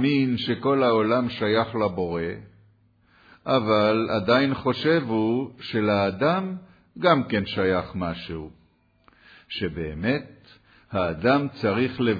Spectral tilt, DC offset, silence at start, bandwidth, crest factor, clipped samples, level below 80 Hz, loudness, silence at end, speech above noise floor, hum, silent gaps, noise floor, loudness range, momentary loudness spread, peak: -8 dB/octave; under 0.1%; 0 s; 5 kHz; 18 dB; under 0.1%; -54 dBFS; -24 LUFS; 0 s; 39 dB; none; none; -62 dBFS; 6 LU; 12 LU; -6 dBFS